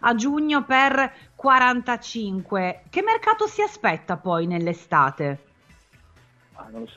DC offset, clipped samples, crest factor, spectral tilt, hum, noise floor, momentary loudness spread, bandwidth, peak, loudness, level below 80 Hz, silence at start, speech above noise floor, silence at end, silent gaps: under 0.1%; under 0.1%; 18 dB; -5 dB/octave; none; -55 dBFS; 12 LU; 8 kHz; -4 dBFS; -22 LUFS; -60 dBFS; 0.05 s; 33 dB; 0.1 s; none